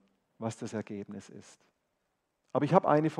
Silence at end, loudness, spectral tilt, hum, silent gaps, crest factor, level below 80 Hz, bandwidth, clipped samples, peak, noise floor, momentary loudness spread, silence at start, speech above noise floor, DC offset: 0 s; -31 LUFS; -7.5 dB/octave; none; none; 26 dB; -80 dBFS; 11 kHz; under 0.1%; -8 dBFS; -80 dBFS; 20 LU; 0.4 s; 50 dB; under 0.1%